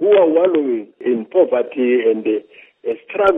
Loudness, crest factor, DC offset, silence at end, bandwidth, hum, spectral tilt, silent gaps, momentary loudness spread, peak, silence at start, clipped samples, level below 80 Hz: -17 LUFS; 14 dB; under 0.1%; 0 s; 3.8 kHz; none; -7.5 dB/octave; none; 11 LU; -2 dBFS; 0 s; under 0.1%; -60 dBFS